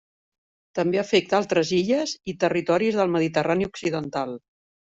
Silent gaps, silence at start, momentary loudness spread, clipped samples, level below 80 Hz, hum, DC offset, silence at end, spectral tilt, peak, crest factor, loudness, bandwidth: none; 0.75 s; 9 LU; under 0.1%; -62 dBFS; none; under 0.1%; 0.45 s; -5 dB/octave; -6 dBFS; 18 dB; -24 LUFS; 8 kHz